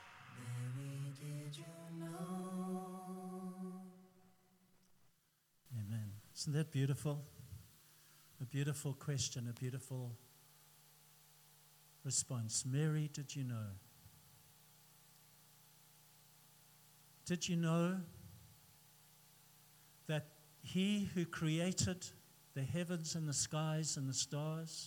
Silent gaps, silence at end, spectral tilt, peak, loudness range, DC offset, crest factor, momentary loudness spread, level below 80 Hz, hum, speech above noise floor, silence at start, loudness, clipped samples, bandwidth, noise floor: none; 0 s; -4.5 dB/octave; -24 dBFS; 11 LU; under 0.1%; 20 dB; 26 LU; -78 dBFS; none; 37 dB; 0 s; -42 LUFS; under 0.1%; 18 kHz; -77 dBFS